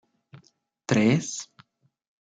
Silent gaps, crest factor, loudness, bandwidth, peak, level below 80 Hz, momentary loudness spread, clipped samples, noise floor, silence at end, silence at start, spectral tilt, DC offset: none; 20 dB; -25 LUFS; 9.4 kHz; -8 dBFS; -68 dBFS; 20 LU; under 0.1%; -63 dBFS; 0.85 s; 0.35 s; -5.5 dB/octave; under 0.1%